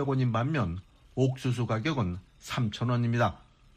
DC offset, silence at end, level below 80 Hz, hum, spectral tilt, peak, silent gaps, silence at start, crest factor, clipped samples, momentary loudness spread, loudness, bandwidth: under 0.1%; 0.4 s; -54 dBFS; none; -7 dB/octave; -14 dBFS; none; 0 s; 16 dB; under 0.1%; 8 LU; -30 LUFS; 10 kHz